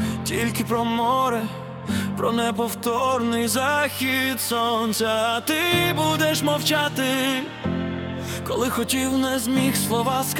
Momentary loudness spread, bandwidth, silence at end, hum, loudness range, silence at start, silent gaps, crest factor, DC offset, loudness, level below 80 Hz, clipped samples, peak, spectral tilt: 7 LU; 18 kHz; 0 s; none; 2 LU; 0 s; none; 16 dB; under 0.1%; -22 LUFS; -56 dBFS; under 0.1%; -6 dBFS; -4 dB/octave